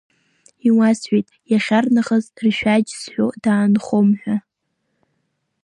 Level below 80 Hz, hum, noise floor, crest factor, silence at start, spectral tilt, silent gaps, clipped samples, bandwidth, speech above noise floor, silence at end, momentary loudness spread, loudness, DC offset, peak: -60 dBFS; none; -73 dBFS; 14 dB; 0.65 s; -6 dB/octave; none; under 0.1%; 10.5 kHz; 56 dB; 1.25 s; 6 LU; -18 LUFS; under 0.1%; -4 dBFS